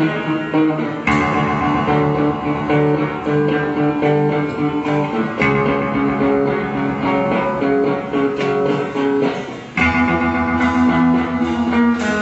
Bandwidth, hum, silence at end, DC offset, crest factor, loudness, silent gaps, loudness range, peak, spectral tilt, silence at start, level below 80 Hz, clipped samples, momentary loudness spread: 8.2 kHz; none; 0 s; under 0.1%; 14 dB; -17 LUFS; none; 1 LU; -2 dBFS; -7.5 dB/octave; 0 s; -40 dBFS; under 0.1%; 4 LU